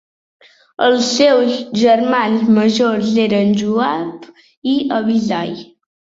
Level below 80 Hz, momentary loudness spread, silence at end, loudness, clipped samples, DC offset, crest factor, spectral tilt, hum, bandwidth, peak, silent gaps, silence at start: -58 dBFS; 10 LU; 0.5 s; -15 LUFS; under 0.1%; under 0.1%; 14 dB; -5 dB/octave; none; 7.8 kHz; -2 dBFS; 4.57-4.62 s; 0.8 s